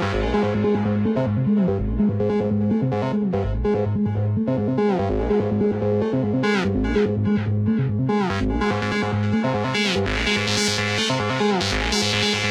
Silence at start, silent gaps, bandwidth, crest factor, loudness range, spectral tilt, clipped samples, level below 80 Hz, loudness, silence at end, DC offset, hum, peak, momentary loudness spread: 0 s; none; 13 kHz; 14 dB; 1 LU; -5.5 dB/octave; under 0.1%; -34 dBFS; -21 LUFS; 0 s; under 0.1%; none; -6 dBFS; 3 LU